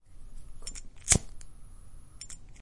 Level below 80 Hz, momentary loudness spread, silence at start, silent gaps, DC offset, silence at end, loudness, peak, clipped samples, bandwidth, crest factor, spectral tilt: -44 dBFS; 22 LU; 0.05 s; none; under 0.1%; 0 s; -27 LUFS; -4 dBFS; under 0.1%; 11.5 kHz; 32 dB; -2 dB/octave